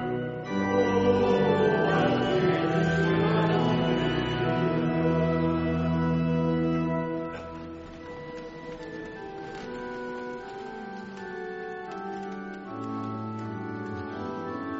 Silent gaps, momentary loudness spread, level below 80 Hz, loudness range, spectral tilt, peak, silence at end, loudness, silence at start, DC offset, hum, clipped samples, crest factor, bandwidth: none; 16 LU; -50 dBFS; 14 LU; -5.5 dB/octave; -12 dBFS; 0 s; -27 LUFS; 0 s; under 0.1%; none; under 0.1%; 16 dB; 7.6 kHz